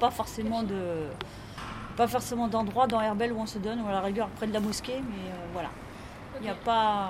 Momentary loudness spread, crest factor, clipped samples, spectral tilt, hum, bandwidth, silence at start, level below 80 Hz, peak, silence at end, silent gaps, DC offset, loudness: 14 LU; 20 dB; under 0.1%; -5 dB/octave; none; 16 kHz; 0 s; -52 dBFS; -10 dBFS; 0 s; none; under 0.1%; -31 LUFS